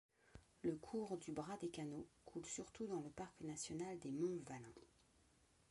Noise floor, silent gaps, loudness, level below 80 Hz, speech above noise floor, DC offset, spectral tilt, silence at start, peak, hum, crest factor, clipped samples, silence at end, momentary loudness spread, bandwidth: -75 dBFS; none; -49 LUFS; -76 dBFS; 27 dB; under 0.1%; -5 dB/octave; 0.35 s; -32 dBFS; none; 18 dB; under 0.1%; 0.85 s; 13 LU; 11.5 kHz